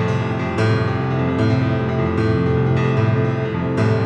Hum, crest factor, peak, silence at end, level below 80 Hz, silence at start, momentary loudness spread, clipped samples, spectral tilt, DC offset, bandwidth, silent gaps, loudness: none; 12 dB; -6 dBFS; 0 s; -40 dBFS; 0 s; 3 LU; under 0.1%; -8.5 dB/octave; under 0.1%; 8.4 kHz; none; -19 LUFS